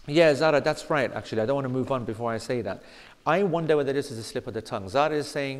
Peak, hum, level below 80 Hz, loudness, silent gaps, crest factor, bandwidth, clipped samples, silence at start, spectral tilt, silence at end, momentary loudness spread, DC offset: -8 dBFS; none; -56 dBFS; -26 LUFS; none; 18 dB; 14 kHz; under 0.1%; 0.05 s; -5.5 dB/octave; 0 s; 12 LU; under 0.1%